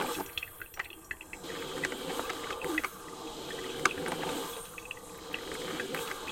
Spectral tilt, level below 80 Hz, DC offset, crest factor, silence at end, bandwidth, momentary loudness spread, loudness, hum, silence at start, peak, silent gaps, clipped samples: -2.5 dB/octave; -60 dBFS; under 0.1%; 30 dB; 0 s; 17 kHz; 11 LU; -37 LUFS; none; 0 s; -6 dBFS; none; under 0.1%